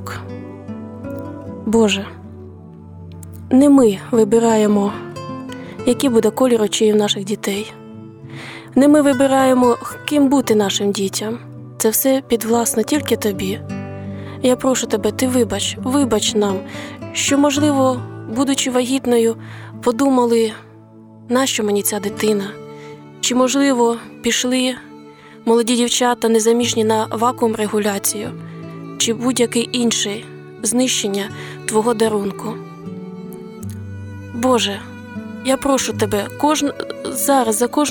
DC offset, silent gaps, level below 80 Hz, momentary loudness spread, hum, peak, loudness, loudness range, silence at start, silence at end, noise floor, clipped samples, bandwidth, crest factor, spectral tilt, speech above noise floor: under 0.1%; none; -52 dBFS; 18 LU; none; -4 dBFS; -17 LUFS; 5 LU; 0 s; 0 s; -42 dBFS; under 0.1%; 19.5 kHz; 14 dB; -4 dB/octave; 25 dB